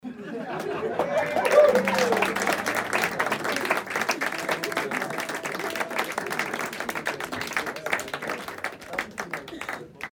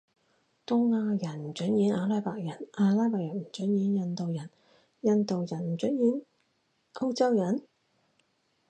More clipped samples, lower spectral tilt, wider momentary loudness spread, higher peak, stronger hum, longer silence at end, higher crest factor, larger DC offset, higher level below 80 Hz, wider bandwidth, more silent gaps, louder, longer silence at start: neither; second, -3 dB/octave vs -7.5 dB/octave; about the same, 12 LU vs 11 LU; first, -6 dBFS vs -12 dBFS; neither; second, 0.05 s vs 1.1 s; about the same, 22 dB vs 18 dB; neither; first, -64 dBFS vs -76 dBFS; first, over 20 kHz vs 9 kHz; neither; first, -26 LUFS vs -29 LUFS; second, 0.05 s vs 0.7 s